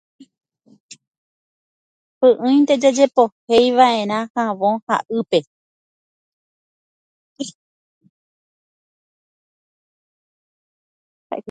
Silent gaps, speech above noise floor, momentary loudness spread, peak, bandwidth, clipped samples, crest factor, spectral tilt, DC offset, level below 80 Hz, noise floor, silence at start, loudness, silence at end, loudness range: 3.32-3.47 s, 4.30-4.35 s, 4.82-4.87 s, 5.47-7.36 s, 7.54-8.01 s, 8.10-11.30 s; over 74 dB; 18 LU; 0 dBFS; 9.2 kHz; under 0.1%; 20 dB; -4.5 dB/octave; under 0.1%; -66 dBFS; under -90 dBFS; 2.2 s; -17 LUFS; 0 s; 24 LU